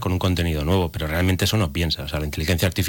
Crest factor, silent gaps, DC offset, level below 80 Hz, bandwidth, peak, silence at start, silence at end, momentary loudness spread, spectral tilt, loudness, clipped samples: 10 dB; none; under 0.1%; -36 dBFS; 17.5 kHz; -12 dBFS; 0 s; 0 s; 5 LU; -5 dB/octave; -22 LUFS; under 0.1%